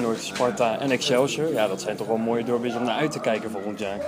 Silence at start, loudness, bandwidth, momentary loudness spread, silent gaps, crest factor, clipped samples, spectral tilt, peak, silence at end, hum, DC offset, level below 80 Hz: 0 s; -25 LUFS; 15.5 kHz; 6 LU; none; 16 dB; under 0.1%; -4.5 dB/octave; -8 dBFS; 0 s; none; under 0.1%; -64 dBFS